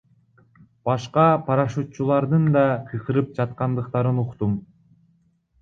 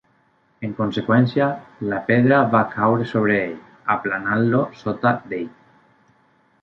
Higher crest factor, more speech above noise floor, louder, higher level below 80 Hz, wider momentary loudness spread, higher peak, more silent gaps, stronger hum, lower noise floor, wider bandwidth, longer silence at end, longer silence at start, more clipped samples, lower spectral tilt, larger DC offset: about the same, 18 dB vs 18 dB; about the same, 42 dB vs 42 dB; about the same, -22 LUFS vs -20 LUFS; about the same, -54 dBFS vs -58 dBFS; second, 8 LU vs 13 LU; about the same, -4 dBFS vs -2 dBFS; neither; neither; about the same, -63 dBFS vs -61 dBFS; first, 7.2 kHz vs 6.4 kHz; second, 0.95 s vs 1.15 s; first, 0.85 s vs 0.6 s; neither; about the same, -8.5 dB/octave vs -9 dB/octave; neither